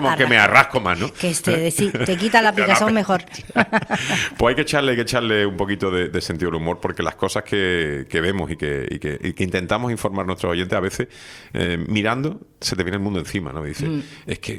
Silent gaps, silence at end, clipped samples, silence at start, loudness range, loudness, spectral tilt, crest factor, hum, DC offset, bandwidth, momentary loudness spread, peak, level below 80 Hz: none; 0 s; under 0.1%; 0 s; 6 LU; -20 LUFS; -4.5 dB/octave; 20 dB; none; under 0.1%; 16.5 kHz; 11 LU; 0 dBFS; -46 dBFS